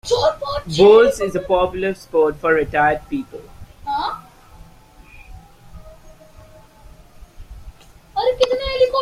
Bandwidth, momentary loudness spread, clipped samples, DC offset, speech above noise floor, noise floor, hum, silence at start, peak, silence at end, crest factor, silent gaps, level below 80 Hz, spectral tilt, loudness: 14 kHz; 16 LU; under 0.1%; under 0.1%; 29 dB; -45 dBFS; none; 0.05 s; -2 dBFS; 0 s; 18 dB; none; -42 dBFS; -4.5 dB/octave; -17 LUFS